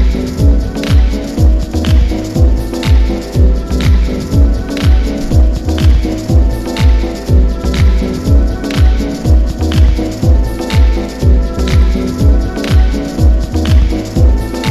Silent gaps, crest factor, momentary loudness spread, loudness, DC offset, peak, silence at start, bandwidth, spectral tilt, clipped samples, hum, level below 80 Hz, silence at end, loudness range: none; 10 dB; 3 LU; -12 LUFS; under 0.1%; 0 dBFS; 0 s; 13 kHz; -7 dB/octave; under 0.1%; none; -10 dBFS; 0 s; 0 LU